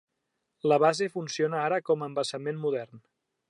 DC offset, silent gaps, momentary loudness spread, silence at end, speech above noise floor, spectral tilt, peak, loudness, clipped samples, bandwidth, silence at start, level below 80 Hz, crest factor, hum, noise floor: under 0.1%; none; 9 LU; 0.5 s; 54 dB; -5 dB/octave; -10 dBFS; -28 LUFS; under 0.1%; 11.5 kHz; 0.65 s; -84 dBFS; 20 dB; none; -81 dBFS